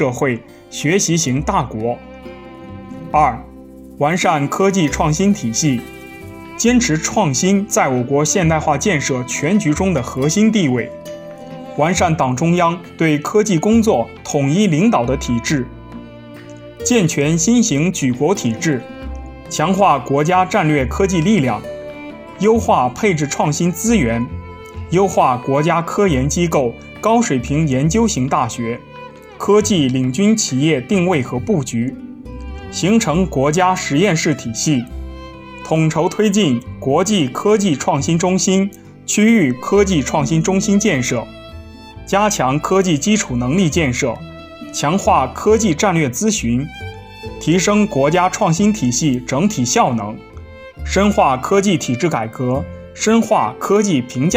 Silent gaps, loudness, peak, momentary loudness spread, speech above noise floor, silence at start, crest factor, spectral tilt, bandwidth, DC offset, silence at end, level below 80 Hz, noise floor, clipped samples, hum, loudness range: none; -16 LUFS; 0 dBFS; 18 LU; 22 dB; 0 s; 16 dB; -5 dB/octave; 16.5 kHz; under 0.1%; 0 s; -36 dBFS; -37 dBFS; under 0.1%; none; 2 LU